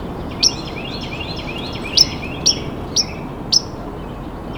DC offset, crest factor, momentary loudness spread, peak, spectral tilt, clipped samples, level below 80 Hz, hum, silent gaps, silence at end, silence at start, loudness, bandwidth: under 0.1%; 22 dB; 16 LU; 0 dBFS; -2 dB/octave; under 0.1%; -36 dBFS; none; none; 0 s; 0 s; -18 LUFS; over 20 kHz